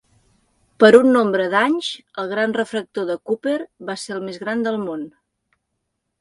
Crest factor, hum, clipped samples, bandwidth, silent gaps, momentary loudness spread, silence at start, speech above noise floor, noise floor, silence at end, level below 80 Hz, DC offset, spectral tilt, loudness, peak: 20 dB; none; under 0.1%; 11.5 kHz; none; 17 LU; 0.8 s; 57 dB; -75 dBFS; 1.1 s; -66 dBFS; under 0.1%; -5 dB/octave; -19 LUFS; 0 dBFS